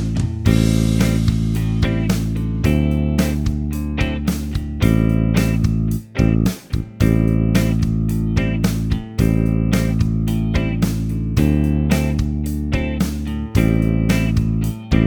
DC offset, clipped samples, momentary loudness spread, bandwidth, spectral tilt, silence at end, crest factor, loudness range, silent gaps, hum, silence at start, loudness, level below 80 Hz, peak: under 0.1%; under 0.1%; 6 LU; over 20 kHz; -7 dB/octave; 0 s; 16 dB; 1 LU; none; none; 0 s; -19 LUFS; -24 dBFS; 0 dBFS